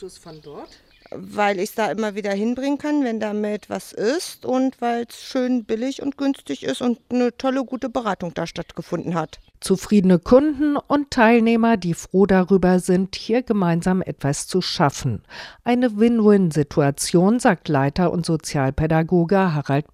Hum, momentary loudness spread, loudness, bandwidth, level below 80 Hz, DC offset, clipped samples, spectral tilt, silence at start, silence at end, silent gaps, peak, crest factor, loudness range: none; 12 LU; -20 LUFS; 14.5 kHz; -46 dBFS; under 0.1%; under 0.1%; -6 dB/octave; 0 s; 0.1 s; none; 0 dBFS; 18 dB; 6 LU